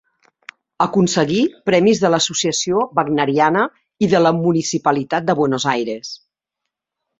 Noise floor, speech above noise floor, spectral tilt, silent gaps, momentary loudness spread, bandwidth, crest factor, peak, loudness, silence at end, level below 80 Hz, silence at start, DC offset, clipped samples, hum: -81 dBFS; 64 dB; -4.5 dB/octave; none; 7 LU; 8 kHz; 18 dB; 0 dBFS; -17 LUFS; 1.05 s; -58 dBFS; 0.8 s; under 0.1%; under 0.1%; none